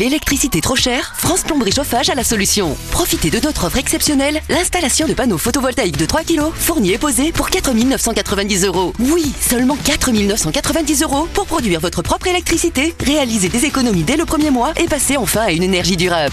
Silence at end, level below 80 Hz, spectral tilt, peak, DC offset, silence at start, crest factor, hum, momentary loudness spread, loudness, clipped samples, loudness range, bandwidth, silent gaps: 0 s; -30 dBFS; -3.5 dB/octave; 0 dBFS; under 0.1%; 0 s; 16 dB; none; 3 LU; -15 LUFS; under 0.1%; 1 LU; 14 kHz; none